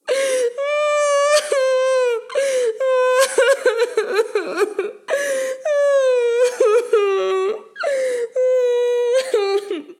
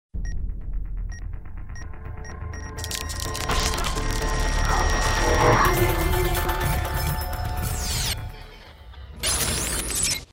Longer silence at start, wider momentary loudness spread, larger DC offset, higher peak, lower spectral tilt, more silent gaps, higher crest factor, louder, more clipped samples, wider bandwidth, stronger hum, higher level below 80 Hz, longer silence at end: about the same, 0.05 s vs 0.15 s; second, 6 LU vs 18 LU; neither; first, 0 dBFS vs -6 dBFS; second, 0 dB/octave vs -3.5 dB/octave; neither; about the same, 16 dB vs 20 dB; first, -18 LUFS vs -24 LUFS; neither; second, 14 kHz vs 16.5 kHz; neither; second, -80 dBFS vs -28 dBFS; about the same, 0.05 s vs 0.1 s